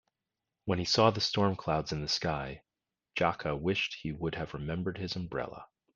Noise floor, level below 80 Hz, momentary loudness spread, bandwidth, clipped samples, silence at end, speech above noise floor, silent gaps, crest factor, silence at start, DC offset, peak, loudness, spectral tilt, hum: -89 dBFS; -56 dBFS; 14 LU; 9.8 kHz; under 0.1%; 0.3 s; 57 dB; none; 22 dB; 0.65 s; under 0.1%; -10 dBFS; -32 LUFS; -5 dB/octave; none